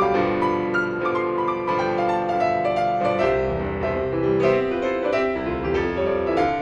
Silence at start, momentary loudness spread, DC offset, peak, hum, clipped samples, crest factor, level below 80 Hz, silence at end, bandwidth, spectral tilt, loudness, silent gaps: 0 s; 4 LU; under 0.1%; -6 dBFS; none; under 0.1%; 16 dB; -42 dBFS; 0 s; 9.2 kHz; -7 dB/octave; -22 LUFS; none